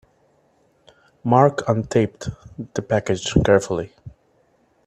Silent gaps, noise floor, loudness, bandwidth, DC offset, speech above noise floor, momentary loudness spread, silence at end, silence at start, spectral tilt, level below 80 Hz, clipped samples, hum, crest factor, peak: none; -61 dBFS; -20 LUFS; 11.5 kHz; under 0.1%; 41 dB; 17 LU; 0.75 s; 1.25 s; -6 dB/octave; -44 dBFS; under 0.1%; none; 22 dB; 0 dBFS